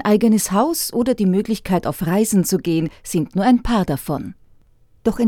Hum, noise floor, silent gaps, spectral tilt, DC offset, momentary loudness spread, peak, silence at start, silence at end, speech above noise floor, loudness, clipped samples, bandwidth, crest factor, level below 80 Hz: none; -52 dBFS; none; -5.5 dB/octave; under 0.1%; 8 LU; -2 dBFS; 0 s; 0 s; 34 dB; -19 LUFS; under 0.1%; 18.5 kHz; 16 dB; -40 dBFS